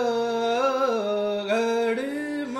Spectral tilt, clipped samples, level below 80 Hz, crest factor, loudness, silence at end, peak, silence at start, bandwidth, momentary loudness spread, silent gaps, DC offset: -4 dB/octave; under 0.1%; -72 dBFS; 12 dB; -25 LUFS; 0 s; -12 dBFS; 0 s; 13 kHz; 5 LU; none; under 0.1%